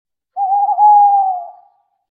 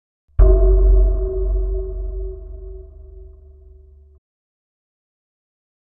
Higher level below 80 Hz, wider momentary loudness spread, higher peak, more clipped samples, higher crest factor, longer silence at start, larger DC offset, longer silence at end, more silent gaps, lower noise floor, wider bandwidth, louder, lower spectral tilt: second, -78 dBFS vs -20 dBFS; second, 16 LU vs 22 LU; about the same, -2 dBFS vs 0 dBFS; neither; second, 12 dB vs 18 dB; about the same, 0.35 s vs 0.4 s; neither; second, 0.6 s vs 2.75 s; neither; first, -53 dBFS vs -45 dBFS; second, 1.4 kHz vs 1.6 kHz; first, -12 LUFS vs -19 LUFS; second, -6.5 dB/octave vs -13.5 dB/octave